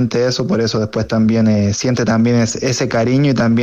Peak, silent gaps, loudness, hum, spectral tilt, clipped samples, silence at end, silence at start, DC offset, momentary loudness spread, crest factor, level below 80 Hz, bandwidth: -4 dBFS; none; -15 LUFS; none; -6 dB/octave; under 0.1%; 0 s; 0 s; under 0.1%; 4 LU; 10 dB; -46 dBFS; 8.2 kHz